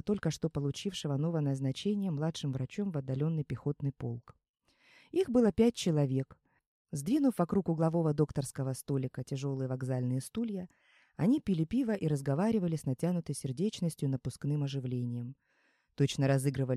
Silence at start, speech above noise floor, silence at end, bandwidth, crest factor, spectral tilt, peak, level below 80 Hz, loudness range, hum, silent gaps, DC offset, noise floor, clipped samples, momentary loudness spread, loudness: 0.05 s; 41 dB; 0 s; 14 kHz; 18 dB; -7 dB/octave; -14 dBFS; -62 dBFS; 4 LU; none; 4.49-4.54 s, 6.67-6.85 s; under 0.1%; -73 dBFS; under 0.1%; 8 LU; -33 LUFS